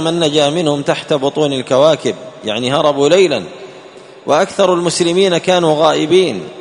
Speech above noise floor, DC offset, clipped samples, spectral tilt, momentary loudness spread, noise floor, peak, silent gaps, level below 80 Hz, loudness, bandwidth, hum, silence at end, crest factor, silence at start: 23 dB; under 0.1%; under 0.1%; -4.5 dB/octave; 10 LU; -36 dBFS; 0 dBFS; none; -56 dBFS; -13 LUFS; 11 kHz; none; 0 s; 14 dB; 0 s